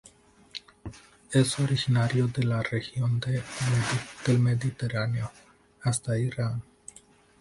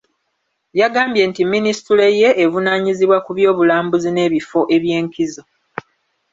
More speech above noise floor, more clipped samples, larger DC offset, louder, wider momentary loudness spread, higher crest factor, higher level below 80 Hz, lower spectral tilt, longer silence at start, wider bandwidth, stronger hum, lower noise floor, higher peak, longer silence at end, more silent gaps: second, 30 dB vs 56 dB; neither; neither; second, -28 LUFS vs -15 LUFS; first, 18 LU vs 10 LU; about the same, 18 dB vs 14 dB; about the same, -56 dBFS vs -60 dBFS; about the same, -5.5 dB/octave vs -5.5 dB/octave; second, 0.55 s vs 0.75 s; first, 11.5 kHz vs 7.8 kHz; neither; second, -56 dBFS vs -70 dBFS; second, -10 dBFS vs -2 dBFS; second, 0.8 s vs 0.95 s; neither